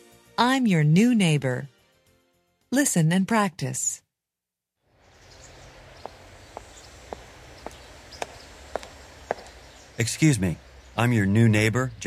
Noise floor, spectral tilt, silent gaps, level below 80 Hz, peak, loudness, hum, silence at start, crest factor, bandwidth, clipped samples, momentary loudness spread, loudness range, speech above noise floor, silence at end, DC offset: -87 dBFS; -5 dB/octave; none; -52 dBFS; -6 dBFS; -23 LUFS; none; 0.4 s; 20 dB; 15.5 kHz; under 0.1%; 24 LU; 21 LU; 66 dB; 0 s; under 0.1%